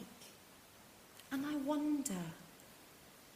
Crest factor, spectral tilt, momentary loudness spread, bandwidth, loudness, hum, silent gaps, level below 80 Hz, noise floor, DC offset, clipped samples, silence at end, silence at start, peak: 18 dB; -4.5 dB/octave; 22 LU; 15.5 kHz; -40 LUFS; none; none; -76 dBFS; -61 dBFS; under 0.1%; under 0.1%; 0 s; 0 s; -24 dBFS